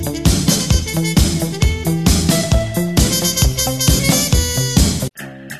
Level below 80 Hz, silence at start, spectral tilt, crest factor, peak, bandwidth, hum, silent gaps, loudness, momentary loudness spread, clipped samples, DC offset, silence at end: -22 dBFS; 0 s; -4 dB/octave; 14 dB; 0 dBFS; 13.5 kHz; none; none; -15 LUFS; 4 LU; under 0.1%; 0.7%; 0 s